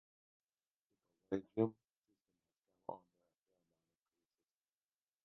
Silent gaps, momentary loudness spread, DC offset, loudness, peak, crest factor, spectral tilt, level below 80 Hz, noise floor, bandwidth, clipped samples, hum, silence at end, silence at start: 1.97-2.02 s; 15 LU; under 0.1%; -43 LUFS; -22 dBFS; 28 dB; -7 dB/octave; -82 dBFS; under -90 dBFS; 3.9 kHz; under 0.1%; none; 2.3 s; 1.3 s